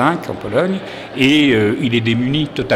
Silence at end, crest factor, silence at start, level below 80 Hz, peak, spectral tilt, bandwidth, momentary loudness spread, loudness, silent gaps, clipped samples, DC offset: 0 s; 16 dB; 0 s; -48 dBFS; 0 dBFS; -6 dB/octave; 14 kHz; 10 LU; -16 LUFS; none; under 0.1%; under 0.1%